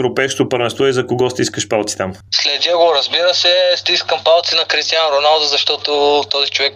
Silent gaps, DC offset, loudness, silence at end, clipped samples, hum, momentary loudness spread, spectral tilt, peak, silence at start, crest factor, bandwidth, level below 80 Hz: none; under 0.1%; -13 LUFS; 0 s; under 0.1%; none; 6 LU; -2.5 dB/octave; 0 dBFS; 0 s; 14 dB; 14.5 kHz; -58 dBFS